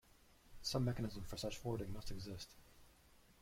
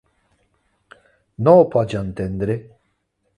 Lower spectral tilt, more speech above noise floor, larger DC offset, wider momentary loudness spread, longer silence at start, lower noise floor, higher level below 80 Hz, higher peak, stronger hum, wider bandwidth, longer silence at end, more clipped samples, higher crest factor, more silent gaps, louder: second, -5.5 dB/octave vs -9 dB/octave; second, 25 dB vs 53 dB; neither; about the same, 13 LU vs 13 LU; second, 0.25 s vs 1.4 s; about the same, -68 dBFS vs -69 dBFS; second, -58 dBFS vs -46 dBFS; second, -28 dBFS vs 0 dBFS; neither; first, 16.5 kHz vs 10.5 kHz; second, 0.1 s vs 0.75 s; neither; about the same, 18 dB vs 20 dB; neither; second, -45 LUFS vs -18 LUFS